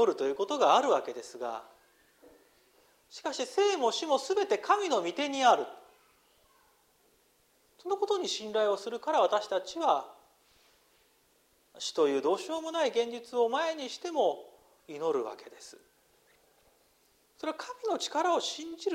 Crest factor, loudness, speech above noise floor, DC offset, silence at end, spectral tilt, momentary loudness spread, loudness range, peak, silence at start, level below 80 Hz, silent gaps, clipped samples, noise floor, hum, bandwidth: 22 dB; -30 LUFS; 38 dB; under 0.1%; 0 s; -2 dB/octave; 14 LU; 7 LU; -10 dBFS; 0 s; -80 dBFS; none; under 0.1%; -68 dBFS; none; 16 kHz